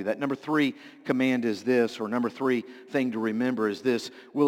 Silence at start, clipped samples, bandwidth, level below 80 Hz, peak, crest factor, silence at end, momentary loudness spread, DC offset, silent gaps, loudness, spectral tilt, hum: 0 s; under 0.1%; 16 kHz; -78 dBFS; -10 dBFS; 16 dB; 0 s; 5 LU; under 0.1%; none; -27 LUFS; -6 dB/octave; none